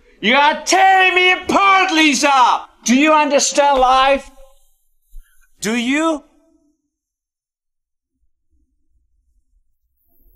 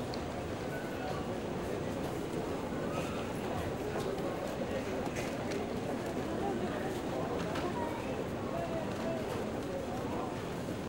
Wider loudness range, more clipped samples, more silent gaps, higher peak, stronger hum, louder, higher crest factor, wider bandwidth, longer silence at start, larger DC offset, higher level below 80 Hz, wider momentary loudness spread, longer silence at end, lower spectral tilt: first, 12 LU vs 1 LU; neither; neither; first, 0 dBFS vs -22 dBFS; neither; first, -13 LUFS vs -37 LUFS; about the same, 16 dB vs 16 dB; second, 14.5 kHz vs 17.5 kHz; first, 0.2 s vs 0 s; neither; first, -46 dBFS vs -54 dBFS; first, 9 LU vs 3 LU; first, 4.15 s vs 0 s; second, -1.5 dB/octave vs -6 dB/octave